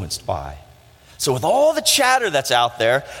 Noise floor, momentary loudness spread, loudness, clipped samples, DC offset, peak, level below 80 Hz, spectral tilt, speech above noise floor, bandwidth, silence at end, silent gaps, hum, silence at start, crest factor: -48 dBFS; 12 LU; -18 LUFS; under 0.1%; under 0.1%; -2 dBFS; -48 dBFS; -2.5 dB/octave; 29 dB; 17 kHz; 0 s; none; none; 0 s; 18 dB